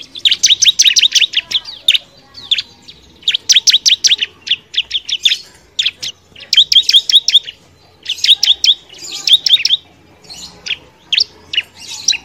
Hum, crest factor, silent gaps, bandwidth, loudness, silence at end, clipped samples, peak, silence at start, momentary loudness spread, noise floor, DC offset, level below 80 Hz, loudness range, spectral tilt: none; 14 dB; none; over 20 kHz; -10 LUFS; 0.05 s; 0.5%; 0 dBFS; 0 s; 16 LU; -46 dBFS; under 0.1%; -56 dBFS; 3 LU; 3.5 dB/octave